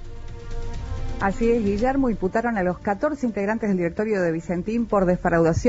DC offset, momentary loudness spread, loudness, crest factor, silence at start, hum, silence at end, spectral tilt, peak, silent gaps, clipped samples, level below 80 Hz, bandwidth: under 0.1%; 14 LU; -23 LUFS; 16 dB; 0 s; none; 0 s; -7.5 dB/octave; -8 dBFS; none; under 0.1%; -34 dBFS; 8 kHz